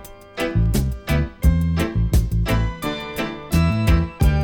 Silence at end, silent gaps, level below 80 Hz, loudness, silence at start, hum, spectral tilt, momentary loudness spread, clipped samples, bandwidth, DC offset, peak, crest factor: 0 s; none; -24 dBFS; -21 LUFS; 0 s; none; -6.5 dB/octave; 8 LU; under 0.1%; 18 kHz; under 0.1%; -6 dBFS; 14 dB